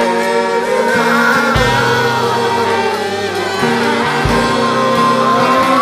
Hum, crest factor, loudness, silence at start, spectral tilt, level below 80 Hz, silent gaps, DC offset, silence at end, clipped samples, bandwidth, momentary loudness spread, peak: none; 12 dB; -13 LUFS; 0 s; -4.5 dB/octave; -34 dBFS; none; under 0.1%; 0 s; under 0.1%; 15.5 kHz; 4 LU; 0 dBFS